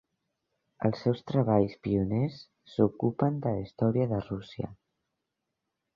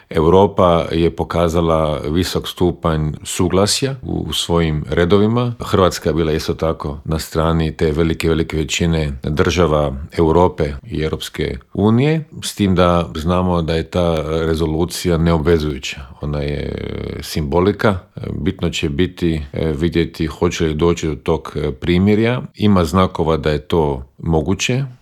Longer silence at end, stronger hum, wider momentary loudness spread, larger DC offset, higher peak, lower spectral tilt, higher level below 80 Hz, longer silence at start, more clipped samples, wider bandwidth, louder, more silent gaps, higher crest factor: first, 1.2 s vs 0.05 s; neither; first, 12 LU vs 9 LU; neither; second, -10 dBFS vs 0 dBFS; first, -10 dB/octave vs -6 dB/octave; second, -56 dBFS vs -34 dBFS; first, 0.8 s vs 0.1 s; neither; second, 7 kHz vs 15.5 kHz; second, -29 LUFS vs -17 LUFS; neither; about the same, 20 dB vs 16 dB